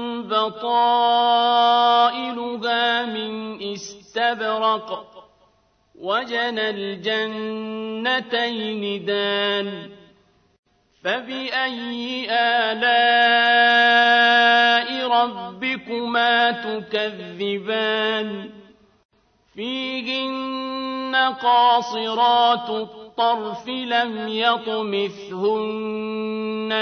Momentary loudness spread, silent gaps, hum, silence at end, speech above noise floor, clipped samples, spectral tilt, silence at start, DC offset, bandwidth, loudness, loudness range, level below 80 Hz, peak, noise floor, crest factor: 14 LU; 10.59-10.63 s, 19.05-19.09 s; none; 0 s; 41 dB; under 0.1%; -4 dB/octave; 0 s; under 0.1%; 6.6 kHz; -20 LUFS; 10 LU; -70 dBFS; -4 dBFS; -62 dBFS; 18 dB